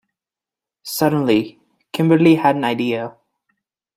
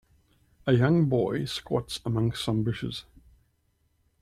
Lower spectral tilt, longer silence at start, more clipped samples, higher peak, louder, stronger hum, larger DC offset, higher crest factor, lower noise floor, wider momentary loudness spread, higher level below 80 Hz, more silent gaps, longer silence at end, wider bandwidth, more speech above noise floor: about the same, -6 dB/octave vs -6.5 dB/octave; first, 0.85 s vs 0.65 s; neither; first, -2 dBFS vs -10 dBFS; first, -17 LUFS vs -27 LUFS; neither; neither; about the same, 18 dB vs 20 dB; first, -89 dBFS vs -71 dBFS; first, 18 LU vs 12 LU; second, -62 dBFS vs -54 dBFS; neither; second, 0.85 s vs 1.2 s; first, 16 kHz vs 14 kHz; first, 73 dB vs 45 dB